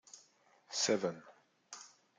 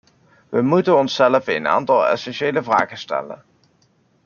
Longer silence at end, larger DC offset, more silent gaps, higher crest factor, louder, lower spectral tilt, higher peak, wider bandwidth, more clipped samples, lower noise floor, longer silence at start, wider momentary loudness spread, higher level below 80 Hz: second, 0.3 s vs 0.9 s; neither; neither; about the same, 22 dB vs 18 dB; second, -36 LUFS vs -18 LUFS; second, -2.5 dB/octave vs -6 dB/octave; second, -18 dBFS vs -2 dBFS; first, 10.5 kHz vs 7 kHz; neither; first, -69 dBFS vs -60 dBFS; second, 0.15 s vs 0.5 s; first, 23 LU vs 11 LU; second, -88 dBFS vs -66 dBFS